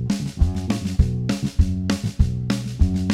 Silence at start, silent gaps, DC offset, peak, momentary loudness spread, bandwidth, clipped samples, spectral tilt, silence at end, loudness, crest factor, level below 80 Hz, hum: 0 s; none; under 0.1%; -2 dBFS; 3 LU; 13.5 kHz; under 0.1%; -6.5 dB/octave; 0 s; -23 LUFS; 18 dB; -26 dBFS; none